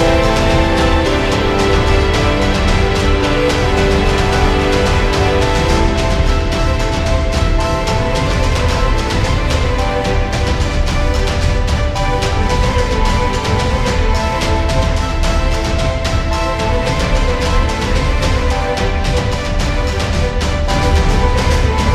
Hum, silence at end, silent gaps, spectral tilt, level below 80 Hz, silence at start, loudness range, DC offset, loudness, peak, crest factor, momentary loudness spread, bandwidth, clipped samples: none; 0 s; none; -5.5 dB/octave; -16 dBFS; 0 s; 3 LU; 0.5%; -15 LUFS; 0 dBFS; 12 dB; 3 LU; 13.5 kHz; under 0.1%